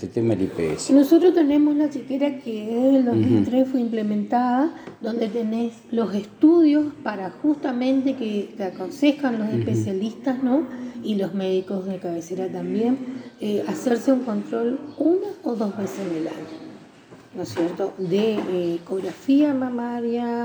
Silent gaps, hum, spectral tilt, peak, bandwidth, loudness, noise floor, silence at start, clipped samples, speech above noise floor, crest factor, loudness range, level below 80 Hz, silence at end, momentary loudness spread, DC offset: none; none; -7 dB/octave; -4 dBFS; over 20 kHz; -22 LUFS; -47 dBFS; 0 s; under 0.1%; 25 dB; 16 dB; 7 LU; -64 dBFS; 0 s; 11 LU; under 0.1%